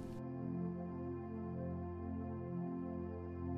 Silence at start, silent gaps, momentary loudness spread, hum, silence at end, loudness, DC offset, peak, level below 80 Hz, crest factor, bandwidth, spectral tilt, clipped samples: 0 s; none; 3 LU; none; 0 s; -44 LUFS; under 0.1%; -32 dBFS; -60 dBFS; 12 dB; 5.2 kHz; -10.5 dB/octave; under 0.1%